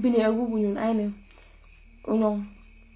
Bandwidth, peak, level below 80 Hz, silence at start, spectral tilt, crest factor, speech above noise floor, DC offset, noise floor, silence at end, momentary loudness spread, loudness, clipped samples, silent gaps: 4 kHz; -10 dBFS; -52 dBFS; 0 s; -11 dB/octave; 16 dB; 27 dB; under 0.1%; -51 dBFS; 0.4 s; 18 LU; -26 LUFS; under 0.1%; none